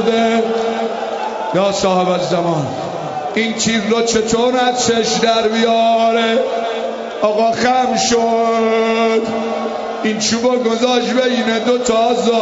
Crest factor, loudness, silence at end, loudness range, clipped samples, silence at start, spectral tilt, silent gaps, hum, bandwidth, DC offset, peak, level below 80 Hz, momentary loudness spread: 14 dB; -15 LUFS; 0 s; 3 LU; under 0.1%; 0 s; -3.5 dB/octave; none; none; 8 kHz; under 0.1%; 0 dBFS; -50 dBFS; 7 LU